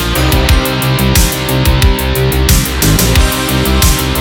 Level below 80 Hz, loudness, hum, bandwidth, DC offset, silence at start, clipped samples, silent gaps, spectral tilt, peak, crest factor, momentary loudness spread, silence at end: -14 dBFS; -11 LUFS; none; 19.5 kHz; under 0.1%; 0 s; under 0.1%; none; -4 dB/octave; 0 dBFS; 10 dB; 2 LU; 0 s